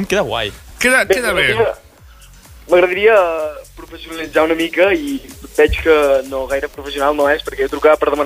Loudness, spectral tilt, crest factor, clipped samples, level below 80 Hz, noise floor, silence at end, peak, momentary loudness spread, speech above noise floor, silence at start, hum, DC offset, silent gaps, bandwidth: -15 LUFS; -4 dB/octave; 14 dB; under 0.1%; -36 dBFS; -42 dBFS; 0 s; -2 dBFS; 14 LU; 27 dB; 0 s; none; under 0.1%; none; 16 kHz